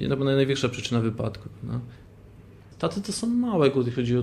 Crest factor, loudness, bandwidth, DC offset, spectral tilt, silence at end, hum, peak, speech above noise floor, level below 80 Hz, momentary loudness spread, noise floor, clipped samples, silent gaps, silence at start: 18 dB; -26 LUFS; 12.5 kHz; under 0.1%; -6 dB/octave; 0 s; none; -8 dBFS; 23 dB; -52 dBFS; 12 LU; -48 dBFS; under 0.1%; none; 0 s